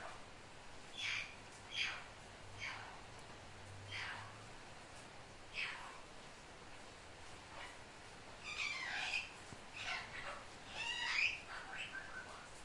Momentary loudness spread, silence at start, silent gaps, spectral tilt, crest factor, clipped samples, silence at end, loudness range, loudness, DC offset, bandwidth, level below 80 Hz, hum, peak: 15 LU; 0 s; none; -1.5 dB/octave; 24 dB; under 0.1%; 0 s; 9 LU; -45 LUFS; under 0.1%; 11.5 kHz; -66 dBFS; none; -24 dBFS